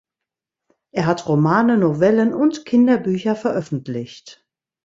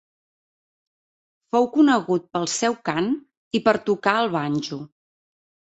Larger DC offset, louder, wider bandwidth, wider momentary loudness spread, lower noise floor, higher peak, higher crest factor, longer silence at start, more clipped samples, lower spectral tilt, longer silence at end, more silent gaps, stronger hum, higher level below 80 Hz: neither; first, -18 LUFS vs -22 LUFS; about the same, 7.8 kHz vs 8.2 kHz; about the same, 12 LU vs 10 LU; second, -85 dBFS vs under -90 dBFS; about the same, -2 dBFS vs -2 dBFS; second, 16 dB vs 22 dB; second, 0.95 s vs 1.55 s; neither; first, -7.5 dB/octave vs -4.5 dB/octave; second, 0.55 s vs 0.9 s; second, none vs 3.37-3.51 s; neither; first, -60 dBFS vs -66 dBFS